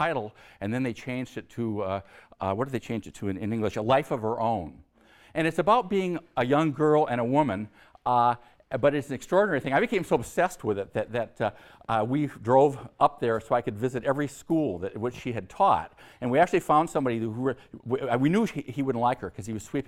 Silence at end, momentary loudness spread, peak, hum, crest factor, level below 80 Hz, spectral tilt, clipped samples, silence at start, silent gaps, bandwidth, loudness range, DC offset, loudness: 0.05 s; 11 LU; -8 dBFS; none; 20 dB; -58 dBFS; -6.5 dB/octave; under 0.1%; 0 s; none; 16 kHz; 4 LU; under 0.1%; -27 LUFS